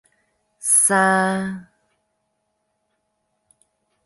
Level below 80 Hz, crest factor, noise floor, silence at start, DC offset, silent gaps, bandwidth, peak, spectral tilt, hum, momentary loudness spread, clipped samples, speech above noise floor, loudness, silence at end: -66 dBFS; 22 dB; -73 dBFS; 0.6 s; under 0.1%; none; 12 kHz; -2 dBFS; -3 dB/octave; none; 16 LU; under 0.1%; 55 dB; -17 LUFS; 2.45 s